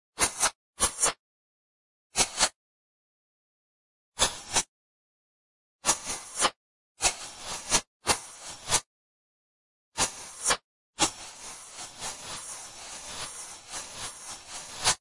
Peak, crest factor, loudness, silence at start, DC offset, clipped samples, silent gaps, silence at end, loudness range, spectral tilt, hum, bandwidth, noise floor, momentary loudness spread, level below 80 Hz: -8 dBFS; 26 dB; -29 LUFS; 0.15 s; under 0.1%; under 0.1%; 0.55-0.73 s, 1.19-2.10 s, 2.55-4.12 s, 4.68-5.79 s, 6.56-6.95 s, 7.87-8.00 s, 8.86-9.92 s, 10.64-10.93 s; 0.05 s; 5 LU; 0 dB/octave; none; 12 kHz; under -90 dBFS; 16 LU; -54 dBFS